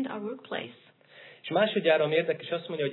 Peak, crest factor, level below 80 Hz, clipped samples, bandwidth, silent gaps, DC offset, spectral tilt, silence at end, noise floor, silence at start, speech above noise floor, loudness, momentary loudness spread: -12 dBFS; 18 dB; under -90 dBFS; under 0.1%; 4.2 kHz; none; under 0.1%; -8.5 dB/octave; 0 s; -53 dBFS; 0 s; 25 dB; -28 LUFS; 13 LU